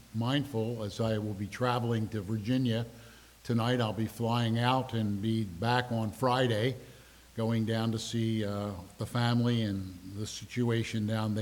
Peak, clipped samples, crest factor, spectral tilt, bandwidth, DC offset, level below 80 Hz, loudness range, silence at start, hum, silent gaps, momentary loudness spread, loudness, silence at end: -12 dBFS; under 0.1%; 20 dB; -6.5 dB/octave; 17.5 kHz; under 0.1%; -60 dBFS; 2 LU; 0.15 s; none; none; 10 LU; -32 LUFS; 0 s